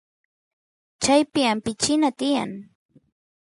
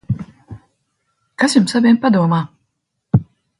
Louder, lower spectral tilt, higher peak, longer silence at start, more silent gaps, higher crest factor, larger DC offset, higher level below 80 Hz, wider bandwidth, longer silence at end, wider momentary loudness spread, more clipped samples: second, -22 LUFS vs -16 LUFS; second, -3 dB/octave vs -6 dB/octave; second, -6 dBFS vs 0 dBFS; first, 1 s vs 0.1 s; neither; about the same, 20 dB vs 18 dB; neither; second, -60 dBFS vs -46 dBFS; about the same, 11.5 kHz vs 11.5 kHz; first, 0.8 s vs 0.35 s; second, 8 LU vs 12 LU; neither